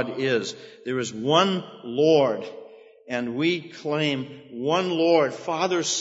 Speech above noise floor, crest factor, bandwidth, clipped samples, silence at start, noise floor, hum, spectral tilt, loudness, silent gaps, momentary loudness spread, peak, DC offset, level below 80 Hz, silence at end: 23 dB; 20 dB; 8 kHz; under 0.1%; 0 s; -47 dBFS; none; -4 dB/octave; -24 LUFS; none; 12 LU; -4 dBFS; under 0.1%; -74 dBFS; 0 s